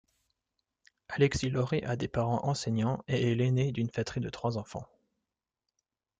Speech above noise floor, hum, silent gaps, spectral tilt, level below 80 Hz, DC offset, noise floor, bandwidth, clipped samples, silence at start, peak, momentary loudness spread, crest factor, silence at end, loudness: 58 dB; none; none; -6.5 dB/octave; -56 dBFS; under 0.1%; -88 dBFS; 9.2 kHz; under 0.1%; 1.1 s; -12 dBFS; 8 LU; 20 dB; 1.35 s; -31 LUFS